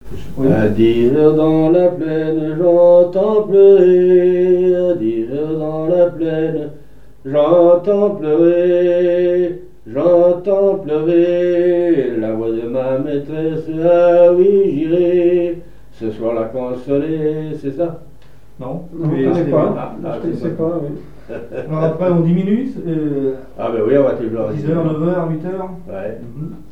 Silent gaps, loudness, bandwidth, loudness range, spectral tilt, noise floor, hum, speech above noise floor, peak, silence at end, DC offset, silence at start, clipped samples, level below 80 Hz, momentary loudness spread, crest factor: none; -15 LUFS; 5.8 kHz; 8 LU; -9.5 dB/octave; -45 dBFS; none; 30 dB; 0 dBFS; 0.1 s; 2%; 0 s; under 0.1%; -44 dBFS; 16 LU; 14 dB